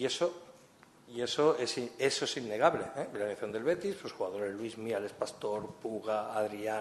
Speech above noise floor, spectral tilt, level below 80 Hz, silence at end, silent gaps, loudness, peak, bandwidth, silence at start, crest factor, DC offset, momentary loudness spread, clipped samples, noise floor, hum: 26 dB; -3.5 dB/octave; -74 dBFS; 0 s; none; -34 LUFS; -10 dBFS; 12.5 kHz; 0 s; 24 dB; under 0.1%; 10 LU; under 0.1%; -60 dBFS; none